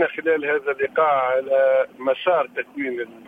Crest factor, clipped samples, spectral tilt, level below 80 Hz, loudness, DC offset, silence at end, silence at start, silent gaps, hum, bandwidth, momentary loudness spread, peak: 14 dB; under 0.1%; -6 dB/octave; -70 dBFS; -21 LUFS; under 0.1%; 0.1 s; 0 s; none; none; 3.8 kHz; 9 LU; -6 dBFS